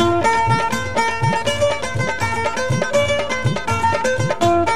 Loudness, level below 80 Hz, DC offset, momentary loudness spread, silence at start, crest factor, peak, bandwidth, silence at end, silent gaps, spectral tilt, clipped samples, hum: -18 LUFS; -42 dBFS; 3%; 4 LU; 0 s; 14 dB; -4 dBFS; 14 kHz; 0 s; none; -5 dB/octave; under 0.1%; none